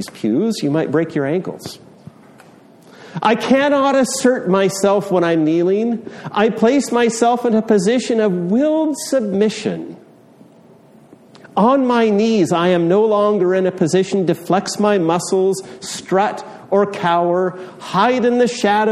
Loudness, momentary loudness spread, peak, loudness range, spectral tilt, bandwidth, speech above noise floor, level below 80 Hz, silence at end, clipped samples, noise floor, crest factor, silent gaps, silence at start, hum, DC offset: -16 LUFS; 9 LU; -2 dBFS; 4 LU; -5.5 dB/octave; 14 kHz; 30 dB; -62 dBFS; 0 s; under 0.1%; -46 dBFS; 16 dB; none; 0 s; none; under 0.1%